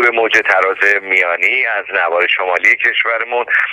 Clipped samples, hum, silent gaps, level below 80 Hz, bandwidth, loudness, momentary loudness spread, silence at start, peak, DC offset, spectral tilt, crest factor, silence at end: under 0.1%; none; none; -64 dBFS; 16.5 kHz; -12 LUFS; 5 LU; 0 s; 0 dBFS; under 0.1%; -1.5 dB/octave; 14 dB; 0 s